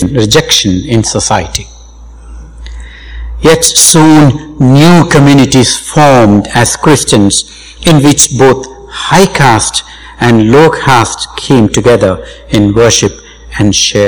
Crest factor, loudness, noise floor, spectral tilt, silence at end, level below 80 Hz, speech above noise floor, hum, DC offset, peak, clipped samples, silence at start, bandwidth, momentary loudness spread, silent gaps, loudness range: 8 dB; -6 LUFS; -30 dBFS; -4 dB/octave; 0 s; -28 dBFS; 24 dB; none; under 0.1%; 0 dBFS; 10%; 0 s; over 20 kHz; 12 LU; none; 4 LU